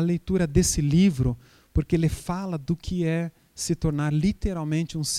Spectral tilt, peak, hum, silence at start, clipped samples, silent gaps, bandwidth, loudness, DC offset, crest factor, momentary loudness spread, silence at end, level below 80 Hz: -5.5 dB/octave; -6 dBFS; none; 0 s; under 0.1%; none; 15 kHz; -25 LUFS; under 0.1%; 20 dB; 9 LU; 0 s; -36 dBFS